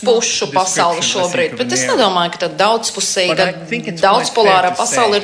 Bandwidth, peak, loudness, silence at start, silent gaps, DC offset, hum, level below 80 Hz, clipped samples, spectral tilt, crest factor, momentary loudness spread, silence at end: 11 kHz; 0 dBFS; -14 LUFS; 0 s; none; under 0.1%; none; -58 dBFS; under 0.1%; -2 dB/octave; 14 dB; 5 LU; 0 s